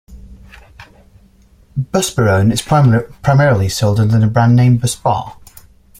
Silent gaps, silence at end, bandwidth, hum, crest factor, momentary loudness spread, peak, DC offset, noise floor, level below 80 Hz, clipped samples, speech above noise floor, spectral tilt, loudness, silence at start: none; 0.7 s; 16 kHz; none; 14 dB; 8 LU; -2 dBFS; under 0.1%; -47 dBFS; -40 dBFS; under 0.1%; 35 dB; -6 dB/octave; -13 LUFS; 0.1 s